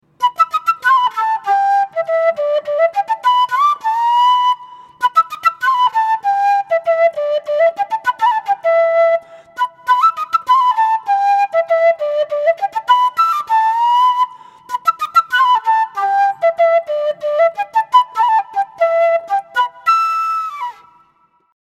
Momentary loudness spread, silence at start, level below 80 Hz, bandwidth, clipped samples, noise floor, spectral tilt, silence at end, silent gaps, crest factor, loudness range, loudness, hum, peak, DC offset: 6 LU; 0.2 s; -72 dBFS; 14 kHz; under 0.1%; -57 dBFS; -0.5 dB/octave; 0.9 s; none; 14 dB; 1 LU; -15 LUFS; none; 0 dBFS; under 0.1%